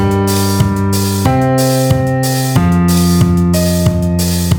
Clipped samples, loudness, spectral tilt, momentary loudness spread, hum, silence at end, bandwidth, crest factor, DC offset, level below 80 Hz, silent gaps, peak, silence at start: under 0.1%; -12 LUFS; -6 dB/octave; 3 LU; none; 0 s; over 20 kHz; 12 dB; under 0.1%; -28 dBFS; none; 0 dBFS; 0 s